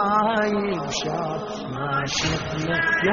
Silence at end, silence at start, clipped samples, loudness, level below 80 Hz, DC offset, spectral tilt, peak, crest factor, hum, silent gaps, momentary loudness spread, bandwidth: 0 s; 0 s; under 0.1%; -24 LUFS; -46 dBFS; under 0.1%; -3 dB/octave; -8 dBFS; 14 dB; none; none; 9 LU; 7.4 kHz